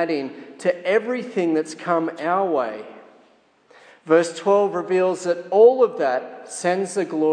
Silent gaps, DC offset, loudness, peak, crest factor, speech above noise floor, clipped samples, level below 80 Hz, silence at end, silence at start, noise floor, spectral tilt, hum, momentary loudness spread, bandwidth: none; under 0.1%; -21 LUFS; -4 dBFS; 18 dB; 37 dB; under 0.1%; -84 dBFS; 0 s; 0 s; -57 dBFS; -5 dB/octave; none; 12 LU; 10 kHz